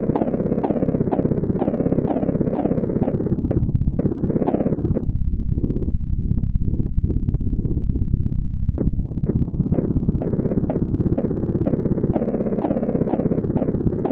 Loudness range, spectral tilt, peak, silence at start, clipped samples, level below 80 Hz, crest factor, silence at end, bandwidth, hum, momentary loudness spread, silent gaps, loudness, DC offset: 2 LU; -13 dB/octave; -4 dBFS; 0 s; under 0.1%; -28 dBFS; 18 dB; 0 s; 3.8 kHz; none; 3 LU; none; -22 LUFS; under 0.1%